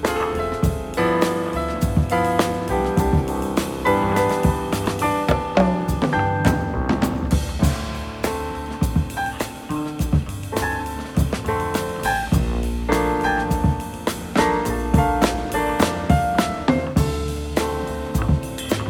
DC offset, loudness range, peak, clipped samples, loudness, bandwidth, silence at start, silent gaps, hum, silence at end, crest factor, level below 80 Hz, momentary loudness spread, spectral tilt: under 0.1%; 4 LU; -2 dBFS; under 0.1%; -22 LUFS; 19 kHz; 0 s; none; none; 0 s; 18 dB; -30 dBFS; 7 LU; -6 dB/octave